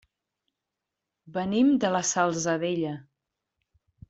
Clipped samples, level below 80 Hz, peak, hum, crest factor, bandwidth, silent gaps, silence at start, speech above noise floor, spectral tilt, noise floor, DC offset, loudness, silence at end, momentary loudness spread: under 0.1%; -68 dBFS; -10 dBFS; none; 18 dB; 8.2 kHz; none; 1.25 s; 61 dB; -4.5 dB/octave; -86 dBFS; under 0.1%; -26 LUFS; 1.1 s; 12 LU